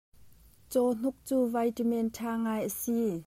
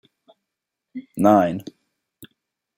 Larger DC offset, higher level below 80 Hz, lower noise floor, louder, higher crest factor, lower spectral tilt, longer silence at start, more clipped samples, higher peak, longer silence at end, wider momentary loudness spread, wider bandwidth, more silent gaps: neither; about the same, -64 dBFS vs -66 dBFS; second, -56 dBFS vs -83 dBFS; second, -31 LUFS vs -18 LUFS; second, 14 dB vs 22 dB; second, -5.5 dB/octave vs -7.5 dB/octave; second, 0.2 s vs 0.95 s; neither; second, -16 dBFS vs -2 dBFS; second, 0.05 s vs 0.5 s; second, 4 LU vs 23 LU; about the same, 16 kHz vs 16.5 kHz; neither